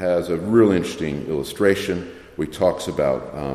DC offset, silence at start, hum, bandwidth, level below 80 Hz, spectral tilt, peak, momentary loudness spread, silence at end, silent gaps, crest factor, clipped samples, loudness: under 0.1%; 0 s; none; 15 kHz; -48 dBFS; -6 dB/octave; -2 dBFS; 12 LU; 0 s; none; 18 dB; under 0.1%; -21 LUFS